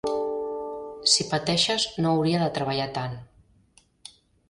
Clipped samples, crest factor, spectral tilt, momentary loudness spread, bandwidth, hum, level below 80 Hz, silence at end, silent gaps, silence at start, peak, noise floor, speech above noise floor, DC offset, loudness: under 0.1%; 20 dB; -3.5 dB/octave; 13 LU; 11.5 kHz; none; -58 dBFS; 1.25 s; none; 0.05 s; -8 dBFS; -61 dBFS; 36 dB; under 0.1%; -25 LUFS